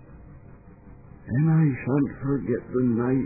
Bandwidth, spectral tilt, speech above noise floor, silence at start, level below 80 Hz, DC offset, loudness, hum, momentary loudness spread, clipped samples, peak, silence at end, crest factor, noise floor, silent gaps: 2.6 kHz; -16 dB/octave; 24 dB; 0.1 s; -50 dBFS; under 0.1%; -24 LUFS; none; 7 LU; under 0.1%; -10 dBFS; 0 s; 14 dB; -47 dBFS; none